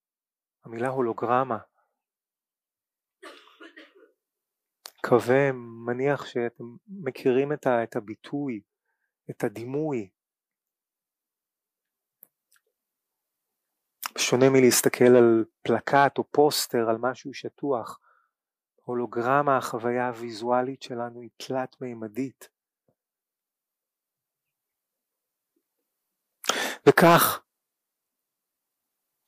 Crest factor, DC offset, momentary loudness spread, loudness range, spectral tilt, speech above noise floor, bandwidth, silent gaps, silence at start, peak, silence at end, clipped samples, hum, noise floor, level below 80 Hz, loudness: 22 dB; under 0.1%; 18 LU; 16 LU; -4.5 dB/octave; over 66 dB; 15.5 kHz; none; 0.65 s; -6 dBFS; 1.9 s; under 0.1%; none; under -90 dBFS; -72 dBFS; -24 LUFS